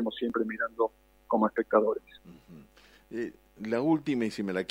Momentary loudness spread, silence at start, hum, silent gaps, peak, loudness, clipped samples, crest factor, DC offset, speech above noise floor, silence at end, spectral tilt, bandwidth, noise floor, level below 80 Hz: 12 LU; 0 s; none; none; -8 dBFS; -30 LUFS; under 0.1%; 22 dB; under 0.1%; 29 dB; 0.05 s; -6.5 dB/octave; 16 kHz; -58 dBFS; -66 dBFS